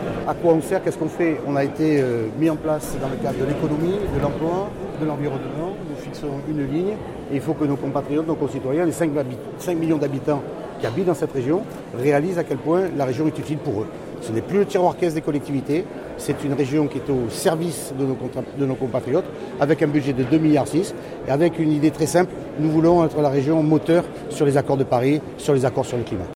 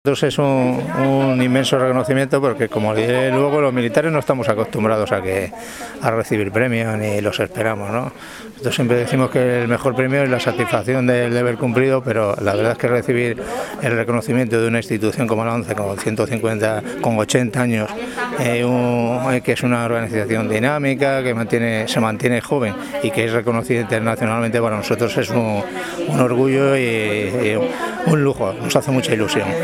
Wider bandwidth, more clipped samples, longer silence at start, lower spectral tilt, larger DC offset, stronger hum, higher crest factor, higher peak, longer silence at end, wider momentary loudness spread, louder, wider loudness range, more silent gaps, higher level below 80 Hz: about the same, 16 kHz vs 16.5 kHz; neither; about the same, 0 s vs 0.05 s; about the same, -7 dB/octave vs -6 dB/octave; neither; neither; about the same, 16 dB vs 18 dB; second, -4 dBFS vs 0 dBFS; about the same, 0 s vs 0 s; first, 9 LU vs 5 LU; second, -22 LUFS vs -18 LUFS; about the same, 5 LU vs 3 LU; neither; first, -46 dBFS vs -52 dBFS